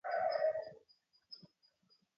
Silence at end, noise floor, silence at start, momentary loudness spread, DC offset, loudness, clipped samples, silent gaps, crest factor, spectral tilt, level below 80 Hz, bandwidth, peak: 0.8 s; -75 dBFS; 0.05 s; 21 LU; under 0.1%; -37 LUFS; under 0.1%; none; 18 dB; 0 dB/octave; -86 dBFS; 5.8 kHz; -24 dBFS